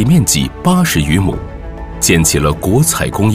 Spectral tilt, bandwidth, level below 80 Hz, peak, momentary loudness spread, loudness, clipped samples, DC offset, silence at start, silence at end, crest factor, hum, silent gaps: -4.5 dB/octave; 16 kHz; -26 dBFS; 0 dBFS; 15 LU; -12 LUFS; under 0.1%; under 0.1%; 0 s; 0 s; 12 dB; none; none